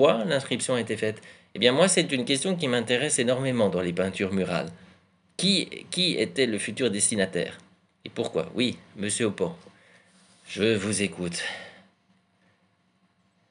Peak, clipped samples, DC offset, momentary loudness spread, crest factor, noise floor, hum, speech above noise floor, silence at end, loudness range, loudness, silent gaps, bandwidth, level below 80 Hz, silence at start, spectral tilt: -4 dBFS; under 0.1%; under 0.1%; 11 LU; 24 dB; -68 dBFS; none; 42 dB; 1.8 s; 7 LU; -26 LUFS; none; 11.5 kHz; -74 dBFS; 0 s; -3.5 dB/octave